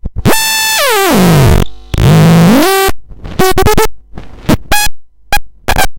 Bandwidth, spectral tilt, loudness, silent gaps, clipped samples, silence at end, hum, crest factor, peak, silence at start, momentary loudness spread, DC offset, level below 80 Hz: 17.5 kHz; -4.5 dB/octave; -9 LUFS; none; under 0.1%; 0 s; none; 8 dB; 0 dBFS; 0.05 s; 11 LU; under 0.1%; -20 dBFS